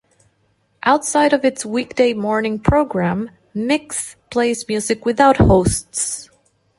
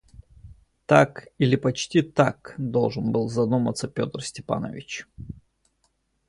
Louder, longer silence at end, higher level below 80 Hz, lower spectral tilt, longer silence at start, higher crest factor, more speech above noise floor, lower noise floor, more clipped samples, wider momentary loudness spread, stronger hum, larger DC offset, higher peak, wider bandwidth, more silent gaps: first, -17 LUFS vs -24 LUFS; second, 0.55 s vs 0.95 s; first, -34 dBFS vs -54 dBFS; about the same, -5 dB/octave vs -6 dB/octave; first, 0.85 s vs 0.45 s; second, 16 dB vs 24 dB; about the same, 46 dB vs 47 dB; second, -63 dBFS vs -70 dBFS; neither; second, 11 LU vs 17 LU; neither; neither; about the same, -2 dBFS vs -2 dBFS; about the same, 12 kHz vs 11.5 kHz; neither